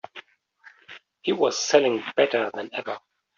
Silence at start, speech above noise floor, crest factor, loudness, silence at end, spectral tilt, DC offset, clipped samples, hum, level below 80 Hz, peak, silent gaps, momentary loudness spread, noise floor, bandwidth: 0.15 s; 32 dB; 22 dB; -24 LUFS; 0.4 s; -1.5 dB/octave; under 0.1%; under 0.1%; none; -72 dBFS; -4 dBFS; none; 24 LU; -55 dBFS; 7.4 kHz